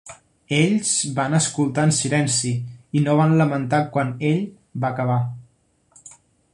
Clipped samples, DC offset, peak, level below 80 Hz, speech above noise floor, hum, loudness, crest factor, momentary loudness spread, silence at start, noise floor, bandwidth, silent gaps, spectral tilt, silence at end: under 0.1%; under 0.1%; -4 dBFS; -58 dBFS; 41 dB; none; -21 LUFS; 18 dB; 8 LU; 0.05 s; -61 dBFS; 11.5 kHz; none; -5 dB/octave; 0.45 s